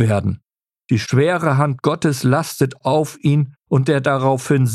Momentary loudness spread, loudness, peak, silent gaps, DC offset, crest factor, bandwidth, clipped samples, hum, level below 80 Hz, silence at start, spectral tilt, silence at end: 5 LU; -18 LUFS; -2 dBFS; none; under 0.1%; 14 dB; 14 kHz; under 0.1%; none; -54 dBFS; 0 s; -6.5 dB/octave; 0 s